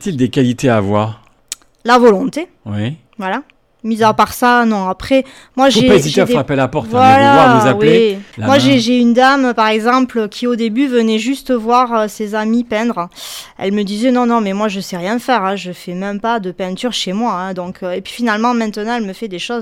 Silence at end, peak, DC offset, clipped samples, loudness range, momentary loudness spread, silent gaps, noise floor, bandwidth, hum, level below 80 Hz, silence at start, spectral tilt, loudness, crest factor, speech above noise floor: 0 s; 0 dBFS; under 0.1%; under 0.1%; 8 LU; 14 LU; none; -33 dBFS; 16 kHz; none; -46 dBFS; 0 s; -5.5 dB/octave; -13 LUFS; 12 dB; 20 dB